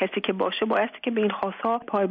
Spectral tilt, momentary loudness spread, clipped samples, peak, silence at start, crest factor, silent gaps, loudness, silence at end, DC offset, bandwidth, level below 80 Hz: -3 dB/octave; 3 LU; under 0.1%; -12 dBFS; 0 s; 14 dB; none; -26 LUFS; 0 s; under 0.1%; 5 kHz; -68 dBFS